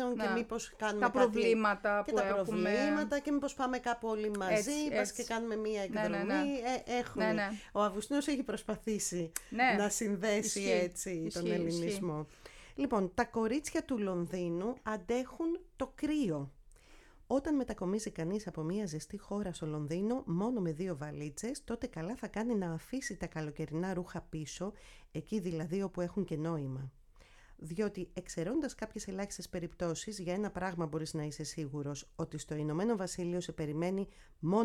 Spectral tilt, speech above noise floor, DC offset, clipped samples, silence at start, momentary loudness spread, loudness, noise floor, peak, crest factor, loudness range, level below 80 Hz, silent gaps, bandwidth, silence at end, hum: -5 dB/octave; 24 dB; under 0.1%; under 0.1%; 0 s; 9 LU; -36 LUFS; -60 dBFS; -16 dBFS; 20 dB; 6 LU; -58 dBFS; none; 17 kHz; 0 s; none